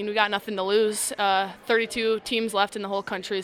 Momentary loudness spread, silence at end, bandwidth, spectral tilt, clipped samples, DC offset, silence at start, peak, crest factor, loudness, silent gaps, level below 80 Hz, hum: 6 LU; 0 s; 16 kHz; -2.5 dB/octave; under 0.1%; under 0.1%; 0 s; -4 dBFS; 20 dB; -25 LUFS; none; -64 dBFS; none